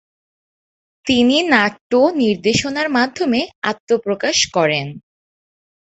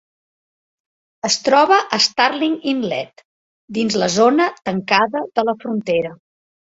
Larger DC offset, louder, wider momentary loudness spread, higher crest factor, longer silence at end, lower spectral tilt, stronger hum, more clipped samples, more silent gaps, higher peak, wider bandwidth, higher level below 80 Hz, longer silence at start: neither; about the same, -16 LUFS vs -17 LUFS; second, 8 LU vs 11 LU; about the same, 18 dB vs 18 dB; first, 0.85 s vs 0.6 s; about the same, -3.5 dB/octave vs -3.5 dB/octave; neither; neither; second, 1.81-1.90 s, 3.55-3.62 s, 3.80-3.87 s vs 3.25-3.68 s; about the same, 0 dBFS vs 0 dBFS; about the same, 8.2 kHz vs 8 kHz; first, -52 dBFS vs -62 dBFS; second, 1.05 s vs 1.25 s